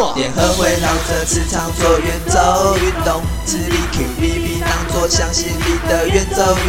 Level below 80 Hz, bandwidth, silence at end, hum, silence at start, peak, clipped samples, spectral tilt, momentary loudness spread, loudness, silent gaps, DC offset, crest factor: -24 dBFS; 17 kHz; 0 s; none; 0 s; 0 dBFS; under 0.1%; -4 dB/octave; 5 LU; -16 LUFS; none; under 0.1%; 16 dB